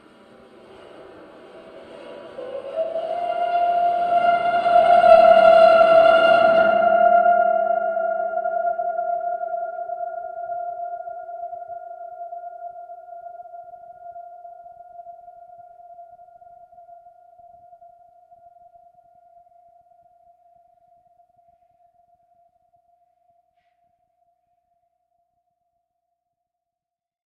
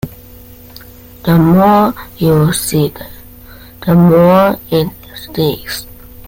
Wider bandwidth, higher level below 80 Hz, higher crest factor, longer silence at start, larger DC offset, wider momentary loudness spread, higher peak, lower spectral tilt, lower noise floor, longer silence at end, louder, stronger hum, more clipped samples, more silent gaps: second, 9 kHz vs 17 kHz; second, -62 dBFS vs -38 dBFS; first, 22 dB vs 12 dB; first, 1 s vs 0.05 s; neither; first, 28 LU vs 16 LU; about the same, 0 dBFS vs 0 dBFS; second, -5 dB/octave vs -6.5 dB/octave; first, -87 dBFS vs -36 dBFS; first, 11.3 s vs 0.4 s; second, -17 LUFS vs -12 LUFS; neither; neither; neither